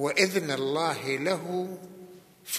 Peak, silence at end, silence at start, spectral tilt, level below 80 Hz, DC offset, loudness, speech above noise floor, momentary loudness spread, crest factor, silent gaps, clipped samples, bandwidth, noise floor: -8 dBFS; 0 s; 0 s; -3.5 dB/octave; -80 dBFS; under 0.1%; -28 LUFS; 22 dB; 22 LU; 22 dB; none; under 0.1%; 15 kHz; -50 dBFS